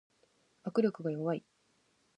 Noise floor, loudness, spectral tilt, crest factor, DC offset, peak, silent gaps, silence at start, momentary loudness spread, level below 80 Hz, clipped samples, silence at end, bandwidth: -73 dBFS; -34 LUFS; -8.5 dB/octave; 20 dB; under 0.1%; -16 dBFS; none; 0.65 s; 9 LU; -86 dBFS; under 0.1%; 0.8 s; 9.6 kHz